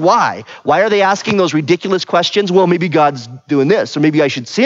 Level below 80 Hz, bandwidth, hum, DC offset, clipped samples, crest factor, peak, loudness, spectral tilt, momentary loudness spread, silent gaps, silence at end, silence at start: -62 dBFS; 7.8 kHz; none; under 0.1%; under 0.1%; 12 dB; 0 dBFS; -13 LUFS; -5.5 dB/octave; 4 LU; none; 0 s; 0 s